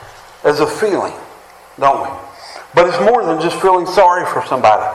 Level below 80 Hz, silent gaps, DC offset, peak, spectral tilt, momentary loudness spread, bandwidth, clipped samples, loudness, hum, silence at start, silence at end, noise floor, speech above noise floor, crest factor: -50 dBFS; none; under 0.1%; 0 dBFS; -4.5 dB/octave; 15 LU; 15 kHz; under 0.1%; -14 LUFS; none; 0 s; 0 s; -40 dBFS; 27 dB; 14 dB